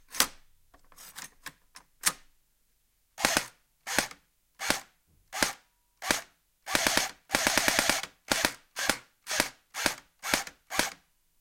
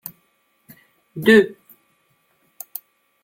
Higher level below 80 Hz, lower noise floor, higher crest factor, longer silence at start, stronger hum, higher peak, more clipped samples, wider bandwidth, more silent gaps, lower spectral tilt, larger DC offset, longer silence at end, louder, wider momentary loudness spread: first, -56 dBFS vs -62 dBFS; first, -71 dBFS vs -65 dBFS; first, 30 dB vs 22 dB; second, 0.1 s vs 1.15 s; neither; about the same, -2 dBFS vs -2 dBFS; neither; about the same, 17 kHz vs 17 kHz; neither; second, -0.5 dB/octave vs -5 dB/octave; neither; second, 0.45 s vs 1.7 s; second, -29 LUFS vs -16 LUFS; second, 19 LU vs 24 LU